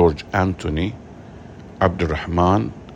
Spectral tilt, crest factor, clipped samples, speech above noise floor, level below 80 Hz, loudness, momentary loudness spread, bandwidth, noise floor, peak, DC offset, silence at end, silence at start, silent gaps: -7.5 dB/octave; 20 dB; under 0.1%; 19 dB; -38 dBFS; -21 LUFS; 22 LU; 8.4 kHz; -39 dBFS; -2 dBFS; under 0.1%; 0 s; 0 s; none